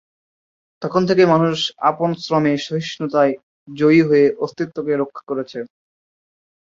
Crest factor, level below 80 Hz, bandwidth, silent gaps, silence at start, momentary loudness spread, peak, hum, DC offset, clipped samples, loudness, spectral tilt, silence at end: 18 dB; -62 dBFS; 7.6 kHz; 3.43-3.66 s; 0.8 s; 16 LU; -2 dBFS; none; under 0.1%; under 0.1%; -18 LUFS; -6.5 dB/octave; 1.1 s